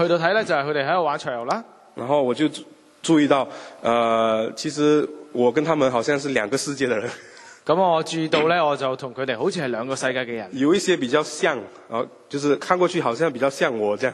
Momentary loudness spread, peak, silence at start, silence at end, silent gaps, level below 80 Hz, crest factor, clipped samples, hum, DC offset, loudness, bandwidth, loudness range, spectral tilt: 10 LU; -2 dBFS; 0 s; 0 s; none; -68 dBFS; 20 dB; under 0.1%; none; under 0.1%; -22 LUFS; 12.5 kHz; 2 LU; -4.5 dB/octave